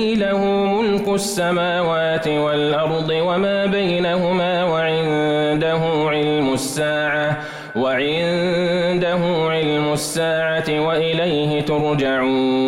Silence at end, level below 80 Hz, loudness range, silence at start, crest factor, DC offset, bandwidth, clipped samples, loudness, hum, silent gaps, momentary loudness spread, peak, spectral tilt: 0 s; -50 dBFS; 1 LU; 0 s; 8 dB; under 0.1%; 16 kHz; under 0.1%; -19 LUFS; none; none; 2 LU; -10 dBFS; -5 dB/octave